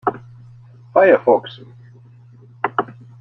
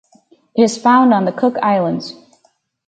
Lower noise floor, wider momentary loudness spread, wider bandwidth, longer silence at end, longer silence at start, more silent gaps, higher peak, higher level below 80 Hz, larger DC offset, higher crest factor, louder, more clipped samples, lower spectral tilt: second, -45 dBFS vs -60 dBFS; first, 24 LU vs 13 LU; second, 5.4 kHz vs 9.2 kHz; second, 0.3 s vs 0.75 s; second, 0.05 s vs 0.55 s; neither; about the same, -2 dBFS vs 0 dBFS; about the same, -64 dBFS vs -64 dBFS; neither; about the same, 18 dB vs 16 dB; about the same, -17 LUFS vs -15 LUFS; neither; first, -8.5 dB/octave vs -5.5 dB/octave